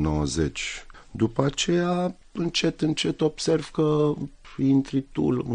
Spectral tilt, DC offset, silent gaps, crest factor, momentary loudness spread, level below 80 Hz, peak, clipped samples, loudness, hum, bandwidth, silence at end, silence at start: -5.5 dB/octave; under 0.1%; none; 20 dB; 9 LU; -44 dBFS; -6 dBFS; under 0.1%; -25 LUFS; none; 10 kHz; 0 s; 0 s